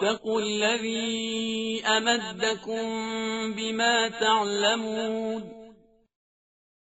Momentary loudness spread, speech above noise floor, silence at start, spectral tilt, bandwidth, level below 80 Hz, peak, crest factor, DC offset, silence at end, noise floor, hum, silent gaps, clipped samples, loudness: 7 LU; 29 dB; 0 s; -1 dB/octave; 8 kHz; -68 dBFS; -8 dBFS; 20 dB; under 0.1%; 1.15 s; -55 dBFS; none; none; under 0.1%; -26 LUFS